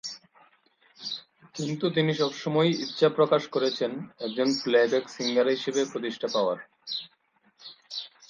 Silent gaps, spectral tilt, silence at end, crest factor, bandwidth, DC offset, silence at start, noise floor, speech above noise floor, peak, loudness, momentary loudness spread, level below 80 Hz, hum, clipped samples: none; -5 dB/octave; 0.2 s; 20 dB; 9.2 kHz; under 0.1%; 0.05 s; -63 dBFS; 37 dB; -8 dBFS; -27 LUFS; 16 LU; -76 dBFS; none; under 0.1%